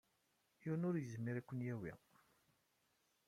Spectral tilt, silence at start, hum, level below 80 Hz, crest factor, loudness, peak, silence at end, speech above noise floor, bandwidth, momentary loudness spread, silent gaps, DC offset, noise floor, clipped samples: -8.5 dB/octave; 0.6 s; none; -80 dBFS; 16 dB; -45 LUFS; -30 dBFS; 1.3 s; 38 dB; 15 kHz; 12 LU; none; under 0.1%; -82 dBFS; under 0.1%